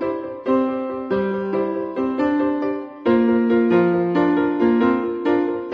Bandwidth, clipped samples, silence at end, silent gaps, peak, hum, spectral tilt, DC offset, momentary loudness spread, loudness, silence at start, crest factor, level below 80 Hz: 5.2 kHz; under 0.1%; 0 s; none; -6 dBFS; none; -9 dB/octave; under 0.1%; 7 LU; -20 LUFS; 0 s; 14 dB; -58 dBFS